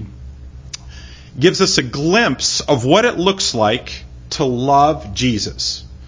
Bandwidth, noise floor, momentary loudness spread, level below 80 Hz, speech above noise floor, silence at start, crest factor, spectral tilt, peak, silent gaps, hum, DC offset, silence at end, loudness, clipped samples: 7.8 kHz; -35 dBFS; 20 LU; -38 dBFS; 20 dB; 0 s; 18 dB; -4 dB/octave; 0 dBFS; none; none; under 0.1%; 0 s; -15 LUFS; under 0.1%